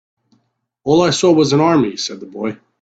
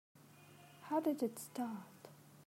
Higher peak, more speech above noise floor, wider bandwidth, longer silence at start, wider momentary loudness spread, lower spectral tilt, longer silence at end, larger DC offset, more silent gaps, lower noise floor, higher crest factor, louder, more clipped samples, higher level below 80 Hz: first, 0 dBFS vs -24 dBFS; first, 51 dB vs 22 dB; second, 9 kHz vs 16 kHz; first, 0.85 s vs 0.15 s; second, 13 LU vs 23 LU; about the same, -5 dB/octave vs -5.5 dB/octave; first, 0.3 s vs 0.05 s; neither; neither; first, -66 dBFS vs -61 dBFS; about the same, 16 dB vs 18 dB; first, -15 LUFS vs -41 LUFS; neither; first, -56 dBFS vs under -90 dBFS